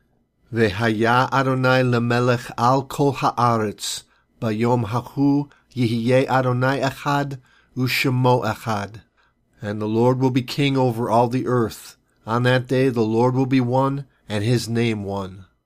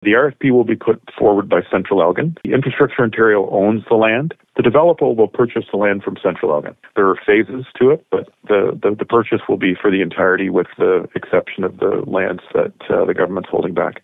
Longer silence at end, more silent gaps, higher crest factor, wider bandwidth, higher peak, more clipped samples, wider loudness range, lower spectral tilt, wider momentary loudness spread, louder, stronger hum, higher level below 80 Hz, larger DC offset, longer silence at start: first, 0.25 s vs 0.1 s; neither; about the same, 16 dB vs 14 dB; first, 15.5 kHz vs 4 kHz; about the same, -4 dBFS vs -2 dBFS; neither; about the same, 3 LU vs 3 LU; second, -6.5 dB/octave vs -9.5 dB/octave; first, 11 LU vs 6 LU; second, -20 LUFS vs -16 LUFS; neither; about the same, -56 dBFS vs -54 dBFS; neither; first, 0.5 s vs 0 s